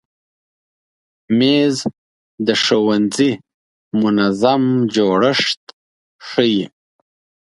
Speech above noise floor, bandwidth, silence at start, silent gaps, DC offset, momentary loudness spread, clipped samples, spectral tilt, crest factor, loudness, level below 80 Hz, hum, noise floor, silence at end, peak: over 75 dB; 11.5 kHz; 1.3 s; 1.98-2.38 s, 3.54-3.91 s, 5.57-5.67 s, 5.73-6.19 s; under 0.1%; 10 LU; under 0.1%; -5 dB/octave; 18 dB; -16 LUFS; -60 dBFS; none; under -90 dBFS; 0.8 s; 0 dBFS